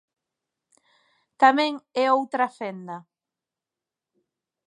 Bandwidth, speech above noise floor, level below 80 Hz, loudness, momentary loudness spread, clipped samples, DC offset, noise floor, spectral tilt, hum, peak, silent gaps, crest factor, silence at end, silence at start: 10 kHz; 66 dB; -86 dBFS; -23 LUFS; 19 LU; under 0.1%; under 0.1%; -89 dBFS; -4.5 dB/octave; none; -4 dBFS; none; 24 dB; 1.65 s; 1.4 s